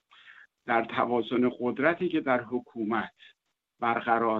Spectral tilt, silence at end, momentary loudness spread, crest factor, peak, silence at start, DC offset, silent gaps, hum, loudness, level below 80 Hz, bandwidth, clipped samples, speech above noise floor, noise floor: -8 dB/octave; 0 s; 7 LU; 20 dB; -10 dBFS; 0.25 s; under 0.1%; none; none; -28 LUFS; -70 dBFS; 4.8 kHz; under 0.1%; 27 dB; -55 dBFS